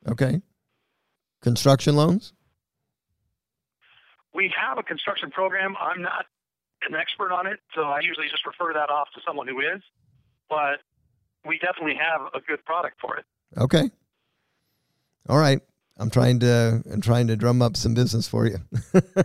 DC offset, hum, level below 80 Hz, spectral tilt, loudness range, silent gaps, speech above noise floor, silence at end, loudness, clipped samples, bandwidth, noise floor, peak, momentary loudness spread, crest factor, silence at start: under 0.1%; none; -54 dBFS; -6 dB/octave; 6 LU; none; 61 dB; 0 s; -24 LUFS; under 0.1%; 14 kHz; -84 dBFS; -6 dBFS; 12 LU; 20 dB; 0.05 s